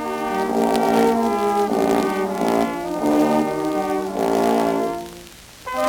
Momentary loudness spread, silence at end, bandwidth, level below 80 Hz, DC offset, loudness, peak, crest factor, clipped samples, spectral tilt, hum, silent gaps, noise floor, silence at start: 10 LU; 0 s; 19.5 kHz; -52 dBFS; under 0.1%; -20 LUFS; -4 dBFS; 16 dB; under 0.1%; -5 dB/octave; none; none; -41 dBFS; 0 s